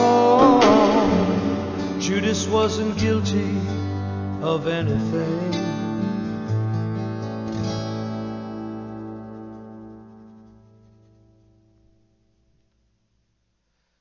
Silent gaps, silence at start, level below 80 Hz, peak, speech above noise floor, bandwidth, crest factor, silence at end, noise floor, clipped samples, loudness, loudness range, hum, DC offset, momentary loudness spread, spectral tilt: none; 0 s; -44 dBFS; -2 dBFS; 49 dB; 7.4 kHz; 20 dB; 3.65 s; -71 dBFS; under 0.1%; -22 LUFS; 18 LU; 60 Hz at -55 dBFS; under 0.1%; 20 LU; -6 dB/octave